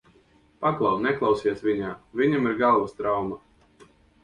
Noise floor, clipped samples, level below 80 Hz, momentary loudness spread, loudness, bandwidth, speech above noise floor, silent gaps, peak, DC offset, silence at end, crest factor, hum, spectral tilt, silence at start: -59 dBFS; under 0.1%; -58 dBFS; 8 LU; -24 LUFS; 9.8 kHz; 35 dB; none; -10 dBFS; under 0.1%; 0.85 s; 16 dB; none; -7.5 dB/octave; 0.6 s